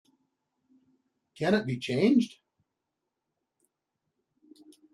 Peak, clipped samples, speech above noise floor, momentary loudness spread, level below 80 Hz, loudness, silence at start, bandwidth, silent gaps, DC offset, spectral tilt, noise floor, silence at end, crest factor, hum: -12 dBFS; under 0.1%; 59 dB; 9 LU; -70 dBFS; -27 LUFS; 1.4 s; 12 kHz; none; under 0.1%; -6.5 dB/octave; -85 dBFS; 2.65 s; 22 dB; none